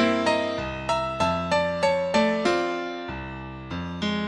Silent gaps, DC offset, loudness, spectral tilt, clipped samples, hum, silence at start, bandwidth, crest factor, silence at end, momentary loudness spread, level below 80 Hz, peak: none; under 0.1%; -25 LUFS; -5 dB/octave; under 0.1%; none; 0 s; 11 kHz; 16 dB; 0 s; 12 LU; -48 dBFS; -8 dBFS